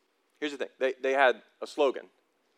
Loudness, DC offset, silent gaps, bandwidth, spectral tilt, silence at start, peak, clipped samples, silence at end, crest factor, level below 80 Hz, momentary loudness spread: -29 LUFS; under 0.1%; none; 12 kHz; -2.5 dB/octave; 0.4 s; -10 dBFS; under 0.1%; 0.55 s; 20 dB; under -90 dBFS; 14 LU